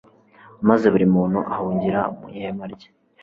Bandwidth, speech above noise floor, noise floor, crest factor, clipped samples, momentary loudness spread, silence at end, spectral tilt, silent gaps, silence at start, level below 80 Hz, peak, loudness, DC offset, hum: 6.6 kHz; 29 dB; -49 dBFS; 20 dB; under 0.1%; 15 LU; 0.45 s; -9.5 dB/octave; none; 0.6 s; -54 dBFS; -2 dBFS; -20 LUFS; under 0.1%; none